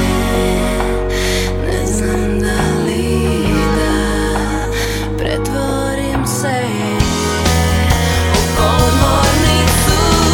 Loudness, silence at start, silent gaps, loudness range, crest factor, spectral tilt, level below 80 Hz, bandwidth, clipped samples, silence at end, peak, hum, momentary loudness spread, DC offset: -15 LUFS; 0 s; none; 4 LU; 14 dB; -4.5 dB/octave; -20 dBFS; 19 kHz; under 0.1%; 0 s; 0 dBFS; none; 6 LU; under 0.1%